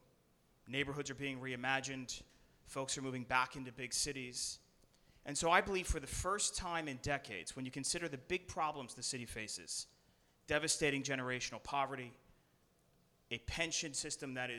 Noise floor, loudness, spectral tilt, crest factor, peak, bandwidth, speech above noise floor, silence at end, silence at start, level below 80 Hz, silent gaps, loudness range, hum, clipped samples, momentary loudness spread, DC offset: -73 dBFS; -39 LUFS; -2.5 dB/octave; 26 dB; -14 dBFS; 17.5 kHz; 33 dB; 0 s; 0.65 s; -56 dBFS; none; 4 LU; none; under 0.1%; 10 LU; under 0.1%